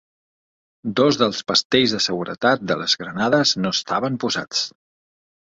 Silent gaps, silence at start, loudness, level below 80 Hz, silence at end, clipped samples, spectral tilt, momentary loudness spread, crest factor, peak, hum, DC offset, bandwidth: 1.65-1.70 s; 0.85 s; -20 LUFS; -60 dBFS; 0.75 s; under 0.1%; -3.5 dB/octave; 7 LU; 20 dB; -2 dBFS; none; under 0.1%; 8 kHz